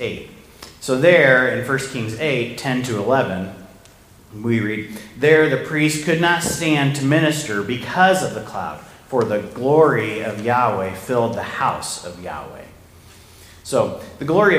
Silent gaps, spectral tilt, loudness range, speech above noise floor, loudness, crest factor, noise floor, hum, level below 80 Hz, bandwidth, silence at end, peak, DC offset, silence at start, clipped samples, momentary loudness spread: none; -5 dB/octave; 5 LU; 28 dB; -19 LUFS; 20 dB; -47 dBFS; none; -52 dBFS; 15.5 kHz; 0 s; 0 dBFS; under 0.1%; 0 s; under 0.1%; 15 LU